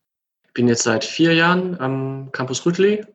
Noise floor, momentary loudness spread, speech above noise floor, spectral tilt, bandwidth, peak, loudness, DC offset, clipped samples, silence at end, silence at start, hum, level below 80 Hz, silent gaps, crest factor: -71 dBFS; 11 LU; 52 dB; -4.5 dB/octave; 8.8 kHz; -2 dBFS; -19 LUFS; under 0.1%; under 0.1%; 0.1 s; 0.55 s; none; -66 dBFS; none; 16 dB